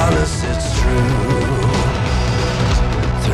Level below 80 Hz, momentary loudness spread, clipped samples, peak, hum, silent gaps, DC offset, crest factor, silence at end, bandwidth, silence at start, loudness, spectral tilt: -20 dBFS; 2 LU; under 0.1%; -2 dBFS; none; none; under 0.1%; 12 dB; 0 s; 13 kHz; 0 s; -17 LUFS; -5.5 dB/octave